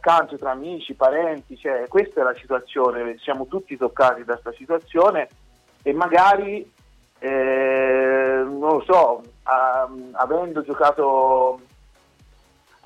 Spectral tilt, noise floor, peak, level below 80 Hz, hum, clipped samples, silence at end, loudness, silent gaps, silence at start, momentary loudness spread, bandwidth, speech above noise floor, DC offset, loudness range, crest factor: -5.5 dB/octave; -56 dBFS; -6 dBFS; -56 dBFS; none; under 0.1%; 1.3 s; -20 LUFS; none; 0.05 s; 12 LU; 9.2 kHz; 36 dB; under 0.1%; 3 LU; 14 dB